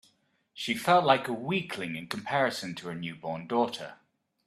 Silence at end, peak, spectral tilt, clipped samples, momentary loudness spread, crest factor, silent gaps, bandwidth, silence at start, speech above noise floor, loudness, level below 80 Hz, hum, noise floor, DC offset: 0.5 s; -8 dBFS; -5 dB/octave; under 0.1%; 14 LU; 24 dB; none; 14 kHz; 0.55 s; 40 dB; -29 LUFS; -72 dBFS; none; -70 dBFS; under 0.1%